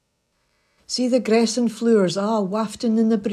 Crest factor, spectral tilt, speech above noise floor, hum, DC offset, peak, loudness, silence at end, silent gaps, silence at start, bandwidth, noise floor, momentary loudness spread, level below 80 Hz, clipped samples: 16 dB; -5 dB/octave; 50 dB; none; under 0.1%; -6 dBFS; -20 LUFS; 0 s; none; 0.9 s; 12 kHz; -70 dBFS; 6 LU; -64 dBFS; under 0.1%